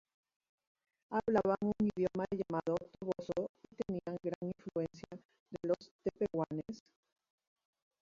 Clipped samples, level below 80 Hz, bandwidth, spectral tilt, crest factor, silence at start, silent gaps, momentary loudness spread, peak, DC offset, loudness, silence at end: under 0.1%; -68 dBFS; 7.6 kHz; -7.5 dB/octave; 20 dB; 1.1 s; 3.49-3.54 s, 4.35-4.41 s, 5.25-5.29 s, 5.40-5.46 s, 5.91-5.99 s; 13 LU; -18 dBFS; under 0.1%; -38 LUFS; 1.2 s